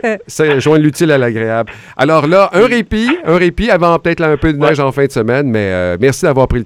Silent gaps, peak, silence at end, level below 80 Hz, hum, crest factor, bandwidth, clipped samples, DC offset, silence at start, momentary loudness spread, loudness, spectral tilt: none; 0 dBFS; 0 s; -32 dBFS; none; 12 dB; 16 kHz; 0.2%; under 0.1%; 0.05 s; 6 LU; -11 LUFS; -6 dB/octave